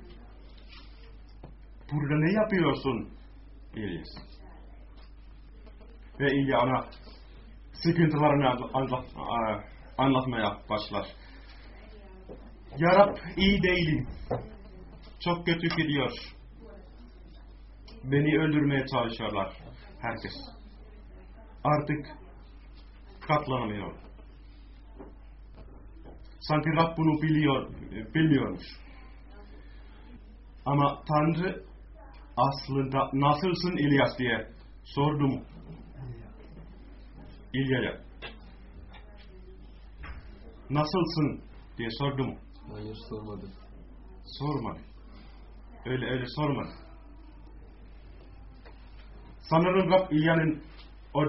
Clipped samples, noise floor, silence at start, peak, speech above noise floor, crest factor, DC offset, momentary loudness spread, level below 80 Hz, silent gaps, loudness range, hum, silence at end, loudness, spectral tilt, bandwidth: under 0.1%; -49 dBFS; 0 s; -8 dBFS; 21 dB; 24 dB; under 0.1%; 26 LU; -48 dBFS; none; 9 LU; none; 0 s; -28 LUFS; -5 dB/octave; 5.8 kHz